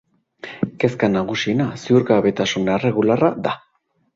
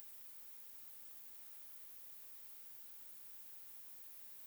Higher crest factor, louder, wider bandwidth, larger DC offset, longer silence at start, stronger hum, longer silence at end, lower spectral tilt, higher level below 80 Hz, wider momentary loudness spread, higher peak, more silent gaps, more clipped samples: second, 18 dB vs 24 dB; first, -19 LUFS vs -51 LUFS; second, 7.8 kHz vs over 20 kHz; neither; first, 0.45 s vs 0 s; neither; first, 0.6 s vs 0 s; first, -6 dB/octave vs 0 dB/octave; first, -54 dBFS vs under -90 dBFS; first, 10 LU vs 0 LU; first, -2 dBFS vs -30 dBFS; neither; neither